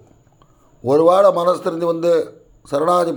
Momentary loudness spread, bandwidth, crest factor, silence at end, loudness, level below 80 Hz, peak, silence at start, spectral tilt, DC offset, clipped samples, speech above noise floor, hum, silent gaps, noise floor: 12 LU; 20 kHz; 16 dB; 0 s; -16 LUFS; -60 dBFS; -2 dBFS; 0.85 s; -6.5 dB/octave; under 0.1%; under 0.1%; 37 dB; none; none; -52 dBFS